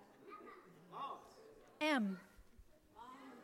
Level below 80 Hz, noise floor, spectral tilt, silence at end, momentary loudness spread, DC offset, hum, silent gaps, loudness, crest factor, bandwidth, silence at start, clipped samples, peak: -74 dBFS; -65 dBFS; -5 dB/octave; 0 s; 24 LU; under 0.1%; none; none; -42 LUFS; 20 dB; 16.5 kHz; 0 s; under 0.1%; -26 dBFS